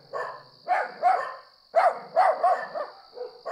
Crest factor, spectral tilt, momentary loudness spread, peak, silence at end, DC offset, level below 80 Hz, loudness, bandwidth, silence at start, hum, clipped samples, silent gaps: 16 dB; -3 dB/octave; 18 LU; -10 dBFS; 0 s; under 0.1%; -82 dBFS; -25 LUFS; 11 kHz; 0.15 s; none; under 0.1%; none